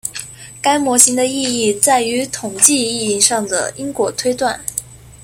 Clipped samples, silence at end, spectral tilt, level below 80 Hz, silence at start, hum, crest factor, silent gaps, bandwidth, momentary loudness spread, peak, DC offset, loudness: 0.1%; 0.1 s; -1.5 dB/octave; -52 dBFS; 0.05 s; none; 16 dB; none; over 20 kHz; 13 LU; 0 dBFS; under 0.1%; -14 LUFS